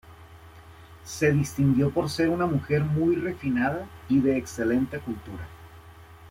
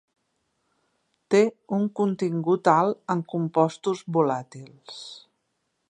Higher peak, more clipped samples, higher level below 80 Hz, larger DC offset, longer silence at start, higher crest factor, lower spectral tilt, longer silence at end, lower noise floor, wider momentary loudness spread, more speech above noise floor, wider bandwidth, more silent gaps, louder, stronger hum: second, -10 dBFS vs -4 dBFS; neither; first, -52 dBFS vs -76 dBFS; neither; second, 0.05 s vs 1.3 s; second, 16 dB vs 22 dB; about the same, -7 dB/octave vs -7 dB/octave; second, 0 s vs 0.7 s; second, -48 dBFS vs -76 dBFS; second, 14 LU vs 19 LU; second, 23 dB vs 52 dB; first, 16 kHz vs 9.8 kHz; neither; about the same, -25 LUFS vs -24 LUFS; neither